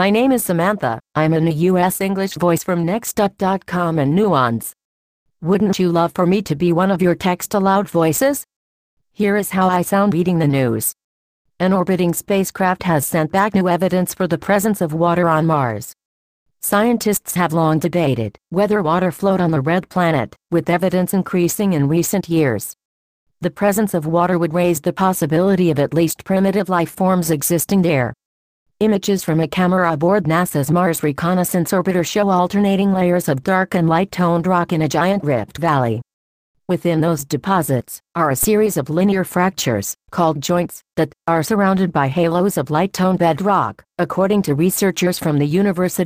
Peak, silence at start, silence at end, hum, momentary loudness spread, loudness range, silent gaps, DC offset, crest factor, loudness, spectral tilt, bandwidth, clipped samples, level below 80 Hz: -2 dBFS; 0 s; 0 s; none; 5 LU; 2 LU; 4.84-5.26 s, 8.56-8.97 s, 11.04-11.45 s, 16.05-16.46 s, 22.85-23.26 s, 28.25-28.66 s, 36.13-36.54 s; under 0.1%; 14 dB; -17 LUFS; -6 dB/octave; 15.5 kHz; under 0.1%; -50 dBFS